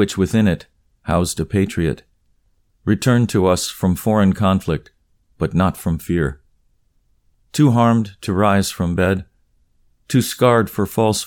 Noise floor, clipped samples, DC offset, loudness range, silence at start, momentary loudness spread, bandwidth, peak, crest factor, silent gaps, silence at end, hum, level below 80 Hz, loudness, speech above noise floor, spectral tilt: -61 dBFS; under 0.1%; under 0.1%; 2 LU; 0 s; 9 LU; 19 kHz; -2 dBFS; 18 dB; none; 0 s; none; -40 dBFS; -18 LUFS; 44 dB; -6 dB/octave